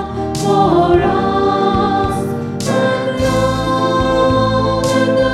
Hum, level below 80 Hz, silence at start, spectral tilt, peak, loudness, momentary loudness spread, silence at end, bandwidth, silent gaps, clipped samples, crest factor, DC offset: none; -32 dBFS; 0 s; -6 dB/octave; 0 dBFS; -14 LUFS; 6 LU; 0 s; 14.5 kHz; none; under 0.1%; 14 dB; 0.2%